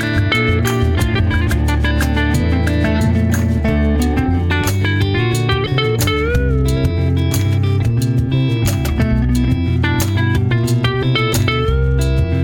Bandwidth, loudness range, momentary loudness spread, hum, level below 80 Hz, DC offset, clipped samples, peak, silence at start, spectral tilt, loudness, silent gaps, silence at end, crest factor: 19 kHz; 0 LU; 1 LU; none; -22 dBFS; under 0.1%; under 0.1%; -2 dBFS; 0 s; -6 dB/octave; -16 LUFS; none; 0 s; 12 dB